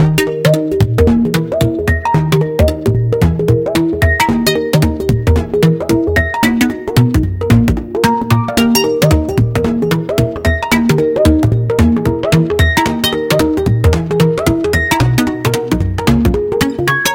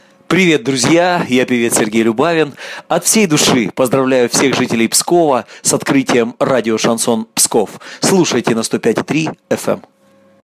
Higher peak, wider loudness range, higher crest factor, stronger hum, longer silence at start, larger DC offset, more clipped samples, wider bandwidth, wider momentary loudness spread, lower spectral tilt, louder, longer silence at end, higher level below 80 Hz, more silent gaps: about the same, 0 dBFS vs 0 dBFS; about the same, 1 LU vs 2 LU; about the same, 12 dB vs 14 dB; neither; second, 0 s vs 0.3 s; neither; neither; first, 17.5 kHz vs 15.5 kHz; second, 3 LU vs 7 LU; first, -6 dB/octave vs -3.5 dB/octave; about the same, -13 LUFS vs -13 LUFS; second, 0 s vs 0.65 s; first, -24 dBFS vs -56 dBFS; neither